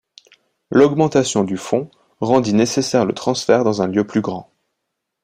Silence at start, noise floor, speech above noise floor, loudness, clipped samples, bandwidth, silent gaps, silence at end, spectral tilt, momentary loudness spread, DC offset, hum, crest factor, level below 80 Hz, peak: 0.7 s; -77 dBFS; 61 dB; -17 LUFS; under 0.1%; 14.5 kHz; none; 0.8 s; -5.5 dB/octave; 9 LU; under 0.1%; none; 18 dB; -56 dBFS; 0 dBFS